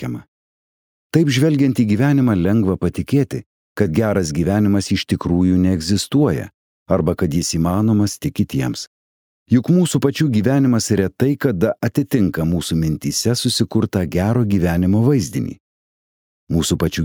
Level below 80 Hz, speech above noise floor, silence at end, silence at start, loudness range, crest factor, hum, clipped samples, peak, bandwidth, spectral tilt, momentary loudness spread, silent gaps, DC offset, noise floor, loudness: -40 dBFS; over 73 dB; 0 s; 0 s; 2 LU; 16 dB; none; under 0.1%; -2 dBFS; 19 kHz; -6 dB/octave; 7 LU; 0.28-1.10 s, 3.46-3.76 s, 6.54-6.86 s, 8.87-9.46 s, 15.60-16.47 s; under 0.1%; under -90 dBFS; -18 LUFS